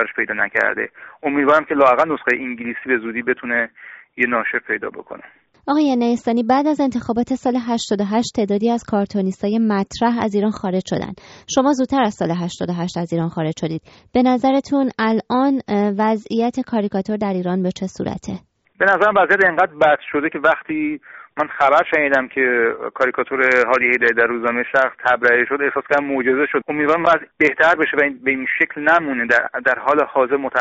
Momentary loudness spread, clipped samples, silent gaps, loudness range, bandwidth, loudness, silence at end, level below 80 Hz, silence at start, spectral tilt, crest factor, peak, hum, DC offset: 10 LU; under 0.1%; none; 4 LU; 8 kHz; -18 LUFS; 0 s; -56 dBFS; 0 s; -4 dB/octave; 16 dB; -2 dBFS; none; under 0.1%